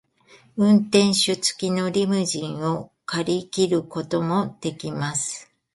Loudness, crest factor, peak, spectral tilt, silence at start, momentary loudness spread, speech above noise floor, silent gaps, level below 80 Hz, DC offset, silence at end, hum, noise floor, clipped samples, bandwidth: -22 LUFS; 20 dB; -2 dBFS; -4.5 dB/octave; 0.55 s; 11 LU; 32 dB; none; -62 dBFS; under 0.1%; 0.3 s; none; -54 dBFS; under 0.1%; 11.5 kHz